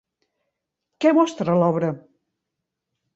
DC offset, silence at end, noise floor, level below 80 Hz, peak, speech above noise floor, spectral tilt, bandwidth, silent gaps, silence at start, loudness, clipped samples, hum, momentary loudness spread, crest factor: under 0.1%; 1.2 s; -82 dBFS; -70 dBFS; -4 dBFS; 63 dB; -7 dB/octave; 8 kHz; none; 1 s; -20 LUFS; under 0.1%; none; 9 LU; 18 dB